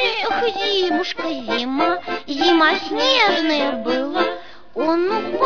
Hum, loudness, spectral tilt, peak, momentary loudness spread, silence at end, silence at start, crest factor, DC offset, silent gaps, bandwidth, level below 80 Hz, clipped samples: none; -19 LUFS; -3 dB/octave; -4 dBFS; 10 LU; 0 s; 0 s; 16 dB; 1%; none; 5.4 kHz; -58 dBFS; under 0.1%